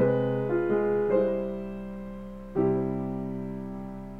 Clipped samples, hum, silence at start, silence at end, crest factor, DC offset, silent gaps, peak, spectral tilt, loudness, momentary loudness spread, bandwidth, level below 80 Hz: under 0.1%; none; 0 s; 0 s; 16 dB; under 0.1%; none; -12 dBFS; -10 dB/octave; -29 LUFS; 14 LU; 4.6 kHz; -48 dBFS